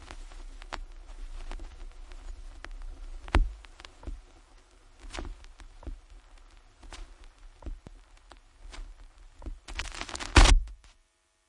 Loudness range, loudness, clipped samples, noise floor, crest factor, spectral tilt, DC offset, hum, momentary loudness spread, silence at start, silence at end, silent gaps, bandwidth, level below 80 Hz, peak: 21 LU; -29 LUFS; under 0.1%; -69 dBFS; 28 dB; -3.5 dB/octave; under 0.1%; none; 24 LU; 0 s; 0.75 s; none; 11.5 kHz; -34 dBFS; -4 dBFS